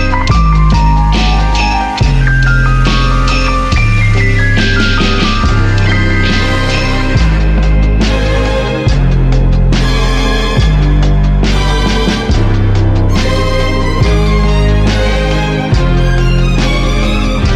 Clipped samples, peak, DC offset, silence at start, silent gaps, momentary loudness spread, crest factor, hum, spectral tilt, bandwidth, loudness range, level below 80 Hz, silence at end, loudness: under 0.1%; 0 dBFS; under 0.1%; 0 s; none; 2 LU; 8 dB; none; -6 dB/octave; 9.8 kHz; 1 LU; -12 dBFS; 0 s; -11 LUFS